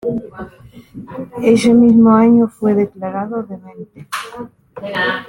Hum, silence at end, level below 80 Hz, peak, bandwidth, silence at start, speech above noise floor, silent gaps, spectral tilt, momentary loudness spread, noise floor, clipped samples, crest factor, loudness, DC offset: none; 0 s; -50 dBFS; -2 dBFS; 11.5 kHz; 0.05 s; 27 dB; none; -6.5 dB/octave; 24 LU; -40 dBFS; under 0.1%; 14 dB; -13 LUFS; under 0.1%